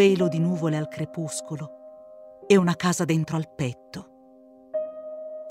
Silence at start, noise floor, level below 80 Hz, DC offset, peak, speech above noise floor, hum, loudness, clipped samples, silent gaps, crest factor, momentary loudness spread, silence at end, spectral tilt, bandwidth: 0 s; -52 dBFS; -66 dBFS; under 0.1%; -6 dBFS; 28 dB; none; -25 LUFS; under 0.1%; none; 20 dB; 23 LU; 0 s; -6 dB/octave; 15 kHz